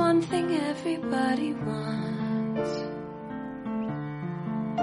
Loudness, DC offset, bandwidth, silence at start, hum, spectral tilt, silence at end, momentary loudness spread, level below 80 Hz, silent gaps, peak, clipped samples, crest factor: -30 LUFS; under 0.1%; 11.5 kHz; 0 s; none; -6.5 dB/octave; 0 s; 10 LU; -60 dBFS; none; -12 dBFS; under 0.1%; 16 dB